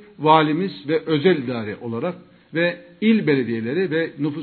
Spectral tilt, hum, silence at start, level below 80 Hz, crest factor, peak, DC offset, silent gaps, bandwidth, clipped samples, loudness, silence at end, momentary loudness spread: -10 dB/octave; none; 0 s; -66 dBFS; 20 dB; 0 dBFS; under 0.1%; none; 4.5 kHz; under 0.1%; -21 LUFS; 0 s; 12 LU